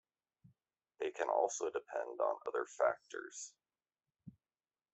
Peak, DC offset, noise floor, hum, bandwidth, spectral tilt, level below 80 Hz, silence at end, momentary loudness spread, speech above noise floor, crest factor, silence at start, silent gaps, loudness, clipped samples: -18 dBFS; under 0.1%; under -90 dBFS; none; 8.2 kHz; -2.5 dB/octave; -88 dBFS; 0.65 s; 13 LU; over 52 dB; 22 dB; 1 s; none; -39 LUFS; under 0.1%